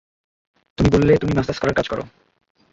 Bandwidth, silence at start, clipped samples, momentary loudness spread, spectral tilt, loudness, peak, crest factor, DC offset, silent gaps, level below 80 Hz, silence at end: 7.8 kHz; 0.8 s; under 0.1%; 17 LU; -7 dB/octave; -19 LUFS; -2 dBFS; 18 dB; under 0.1%; none; -36 dBFS; 0.65 s